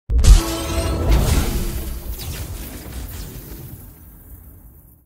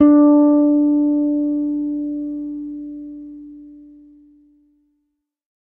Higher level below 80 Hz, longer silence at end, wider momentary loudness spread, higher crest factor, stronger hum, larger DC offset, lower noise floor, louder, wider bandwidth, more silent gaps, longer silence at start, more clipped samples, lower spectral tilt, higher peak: first, -20 dBFS vs -56 dBFS; second, 0.35 s vs 1.85 s; first, 26 LU vs 23 LU; about the same, 20 dB vs 16 dB; neither; neither; second, -45 dBFS vs -74 dBFS; second, -21 LUFS vs -17 LUFS; first, 16 kHz vs 2.2 kHz; neither; about the same, 0.1 s vs 0 s; neither; second, -5 dB/octave vs -11 dB/octave; about the same, 0 dBFS vs -2 dBFS